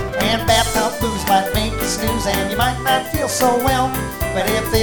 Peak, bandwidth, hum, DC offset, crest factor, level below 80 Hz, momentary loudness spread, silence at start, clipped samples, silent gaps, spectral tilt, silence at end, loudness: -2 dBFS; over 20 kHz; none; under 0.1%; 16 dB; -30 dBFS; 5 LU; 0 s; under 0.1%; none; -3.5 dB/octave; 0 s; -18 LUFS